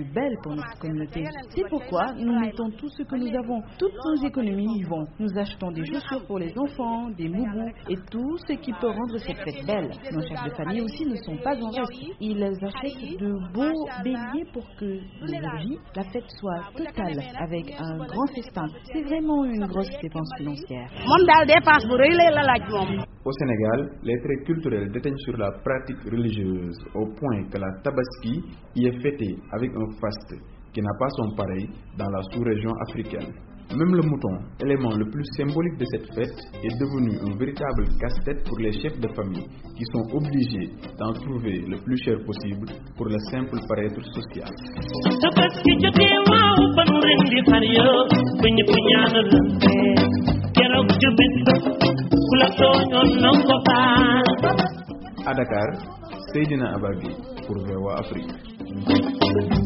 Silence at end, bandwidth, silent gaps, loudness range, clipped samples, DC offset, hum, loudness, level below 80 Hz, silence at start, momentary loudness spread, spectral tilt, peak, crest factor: 0 s; 6 kHz; none; 13 LU; under 0.1%; under 0.1%; none; -22 LUFS; -40 dBFS; 0 s; 17 LU; -4 dB/octave; -2 dBFS; 22 dB